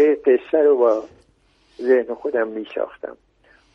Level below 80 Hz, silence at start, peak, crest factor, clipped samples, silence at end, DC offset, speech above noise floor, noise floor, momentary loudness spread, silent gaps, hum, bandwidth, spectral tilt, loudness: -64 dBFS; 0 s; -4 dBFS; 16 dB; under 0.1%; 0.6 s; under 0.1%; 40 dB; -59 dBFS; 13 LU; none; none; 6 kHz; -6.5 dB/octave; -20 LUFS